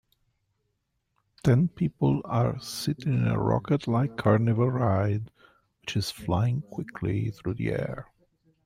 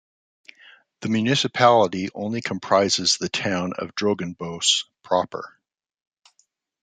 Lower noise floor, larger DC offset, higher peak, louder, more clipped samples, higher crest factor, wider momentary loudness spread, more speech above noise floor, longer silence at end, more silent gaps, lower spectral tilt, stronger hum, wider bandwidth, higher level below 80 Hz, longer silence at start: first, -77 dBFS vs -67 dBFS; neither; second, -10 dBFS vs -2 dBFS; second, -27 LUFS vs -22 LUFS; neither; about the same, 18 dB vs 20 dB; second, 9 LU vs 12 LU; first, 52 dB vs 45 dB; second, 0.65 s vs 1.35 s; neither; first, -7 dB/octave vs -3.5 dB/octave; neither; first, 15.5 kHz vs 9.6 kHz; first, -54 dBFS vs -68 dBFS; first, 1.45 s vs 1 s